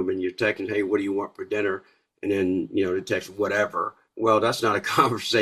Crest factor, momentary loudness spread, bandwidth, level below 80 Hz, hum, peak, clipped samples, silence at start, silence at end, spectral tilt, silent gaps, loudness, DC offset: 20 dB; 8 LU; 14.5 kHz; -66 dBFS; none; -4 dBFS; under 0.1%; 0 s; 0 s; -4.5 dB/octave; none; -25 LUFS; under 0.1%